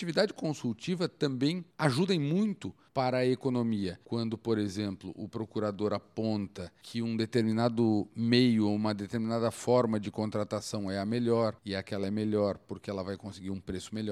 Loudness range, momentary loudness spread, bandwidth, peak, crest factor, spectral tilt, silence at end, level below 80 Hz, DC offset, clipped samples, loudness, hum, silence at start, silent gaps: 5 LU; 11 LU; 13 kHz; -12 dBFS; 20 dB; -6.5 dB/octave; 0 s; -66 dBFS; under 0.1%; under 0.1%; -31 LUFS; none; 0 s; none